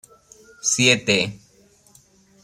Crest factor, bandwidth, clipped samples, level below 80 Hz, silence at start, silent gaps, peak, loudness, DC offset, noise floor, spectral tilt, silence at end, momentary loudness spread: 22 dB; 16 kHz; under 0.1%; -62 dBFS; 0.65 s; none; -2 dBFS; -18 LUFS; under 0.1%; -55 dBFS; -2.5 dB/octave; 1.05 s; 10 LU